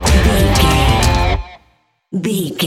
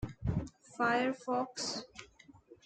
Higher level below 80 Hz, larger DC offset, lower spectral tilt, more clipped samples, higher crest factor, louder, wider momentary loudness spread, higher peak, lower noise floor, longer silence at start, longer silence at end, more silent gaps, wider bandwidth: first, -18 dBFS vs -52 dBFS; neither; about the same, -4.5 dB/octave vs -4.5 dB/octave; neither; second, 14 dB vs 20 dB; first, -14 LUFS vs -35 LUFS; second, 11 LU vs 18 LU; first, 0 dBFS vs -18 dBFS; about the same, -57 dBFS vs -59 dBFS; about the same, 0 s vs 0 s; about the same, 0 s vs 0.1 s; neither; first, 16.5 kHz vs 9.4 kHz